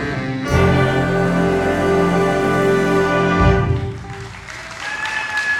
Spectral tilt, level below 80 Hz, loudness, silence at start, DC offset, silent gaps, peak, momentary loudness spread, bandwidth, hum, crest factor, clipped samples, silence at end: -6.5 dB/octave; -32 dBFS; -17 LUFS; 0 s; under 0.1%; none; -2 dBFS; 15 LU; 14 kHz; none; 14 dB; under 0.1%; 0 s